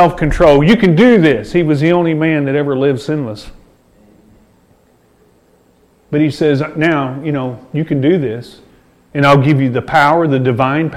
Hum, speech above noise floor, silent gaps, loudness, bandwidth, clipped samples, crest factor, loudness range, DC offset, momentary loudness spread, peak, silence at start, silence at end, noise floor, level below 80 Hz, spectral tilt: none; 39 dB; none; -12 LUFS; 12.5 kHz; under 0.1%; 14 dB; 11 LU; under 0.1%; 12 LU; 0 dBFS; 0 s; 0 s; -51 dBFS; -34 dBFS; -7.5 dB/octave